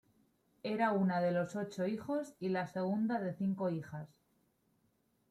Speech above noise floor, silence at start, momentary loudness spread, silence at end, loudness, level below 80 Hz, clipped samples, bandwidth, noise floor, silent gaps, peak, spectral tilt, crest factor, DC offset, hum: 41 dB; 0.65 s; 11 LU; 1.25 s; -36 LUFS; -78 dBFS; under 0.1%; 11.5 kHz; -76 dBFS; none; -20 dBFS; -7.5 dB/octave; 16 dB; under 0.1%; none